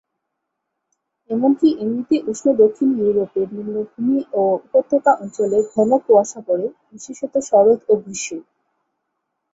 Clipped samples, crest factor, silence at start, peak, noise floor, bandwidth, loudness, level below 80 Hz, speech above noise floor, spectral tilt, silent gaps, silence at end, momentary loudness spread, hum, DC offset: under 0.1%; 16 dB; 1.3 s; -2 dBFS; -77 dBFS; 8 kHz; -18 LUFS; -64 dBFS; 60 dB; -6 dB/octave; none; 1.15 s; 12 LU; none; under 0.1%